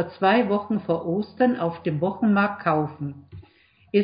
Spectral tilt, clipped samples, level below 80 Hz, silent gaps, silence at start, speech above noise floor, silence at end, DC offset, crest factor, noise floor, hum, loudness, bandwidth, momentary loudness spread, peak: -11.5 dB/octave; under 0.1%; -58 dBFS; none; 0 s; 34 dB; 0 s; under 0.1%; 18 dB; -57 dBFS; none; -23 LUFS; 5.2 kHz; 10 LU; -6 dBFS